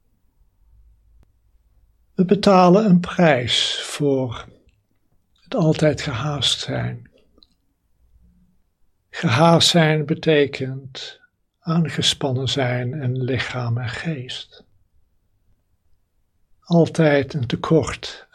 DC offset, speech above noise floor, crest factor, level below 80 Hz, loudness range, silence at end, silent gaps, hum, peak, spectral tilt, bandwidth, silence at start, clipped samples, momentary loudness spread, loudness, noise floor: under 0.1%; 46 dB; 20 dB; -52 dBFS; 9 LU; 0.15 s; none; none; 0 dBFS; -5.5 dB/octave; 13.5 kHz; 2.2 s; under 0.1%; 18 LU; -19 LUFS; -64 dBFS